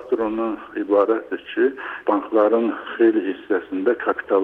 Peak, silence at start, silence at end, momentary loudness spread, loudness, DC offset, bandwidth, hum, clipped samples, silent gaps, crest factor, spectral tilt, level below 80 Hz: -6 dBFS; 0 s; 0 s; 7 LU; -21 LUFS; under 0.1%; 4 kHz; none; under 0.1%; none; 14 dB; -7.5 dB/octave; -62 dBFS